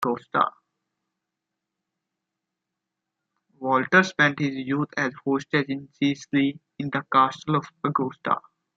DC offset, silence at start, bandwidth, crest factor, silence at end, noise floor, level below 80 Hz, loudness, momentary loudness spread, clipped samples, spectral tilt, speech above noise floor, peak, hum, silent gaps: under 0.1%; 0 s; 7.6 kHz; 24 dB; 0.35 s; -84 dBFS; -70 dBFS; -24 LUFS; 9 LU; under 0.1%; -6 dB/octave; 60 dB; -4 dBFS; none; none